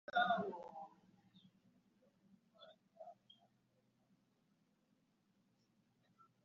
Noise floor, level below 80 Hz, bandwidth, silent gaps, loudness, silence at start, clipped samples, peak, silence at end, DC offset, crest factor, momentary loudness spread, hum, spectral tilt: -80 dBFS; under -90 dBFS; 7 kHz; none; -41 LUFS; 0.15 s; under 0.1%; -24 dBFS; 3.3 s; under 0.1%; 26 dB; 27 LU; none; -2 dB/octave